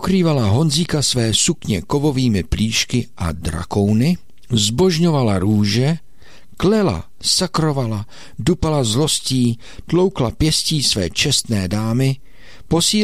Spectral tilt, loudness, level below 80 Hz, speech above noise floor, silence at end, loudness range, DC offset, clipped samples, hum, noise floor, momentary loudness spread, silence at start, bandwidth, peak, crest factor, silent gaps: -4.5 dB/octave; -17 LUFS; -36 dBFS; 30 dB; 0 s; 2 LU; 2%; under 0.1%; none; -47 dBFS; 7 LU; 0 s; 16 kHz; -4 dBFS; 14 dB; none